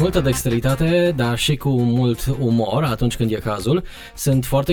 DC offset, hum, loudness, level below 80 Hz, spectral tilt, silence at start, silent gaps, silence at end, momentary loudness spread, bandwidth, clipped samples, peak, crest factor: under 0.1%; none; -19 LUFS; -34 dBFS; -6 dB/octave; 0 s; none; 0 s; 4 LU; 19.5 kHz; under 0.1%; -4 dBFS; 14 dB